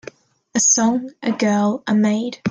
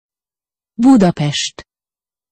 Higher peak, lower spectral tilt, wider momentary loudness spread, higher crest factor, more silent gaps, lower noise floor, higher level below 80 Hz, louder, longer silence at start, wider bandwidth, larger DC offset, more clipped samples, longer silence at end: about the same, -4 dBFS vs -2 dBFS; second, -3.5 dB/octave vs -5.5 dB/octave; second, 9 LU vs 13 LU; about the same, 14 dB vs 14 dB; neither; second, -41 dBFS vs under -90 dBFS; second, -64 dBFS vs -50 dBFS; second, -18 LUFS vs -13 LUFS; second, 0.55 s vs 0.8 s; first, 10 kHz vs 8.8 kHz; neither; neither; second, 0 s vs 0.7 s